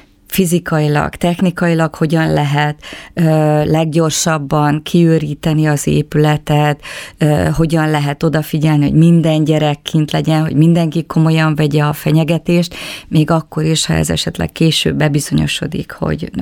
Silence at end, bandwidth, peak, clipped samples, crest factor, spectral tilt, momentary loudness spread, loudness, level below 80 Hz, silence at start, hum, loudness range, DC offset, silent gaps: 0 s; 17 kHz; -2 dBFS; under 0.1%; 12 dB; -6 dB/octave; 6 LU; -14 LUFS; -38 dBFS; 0.3 s; none; 2 LU; under 0.1%; none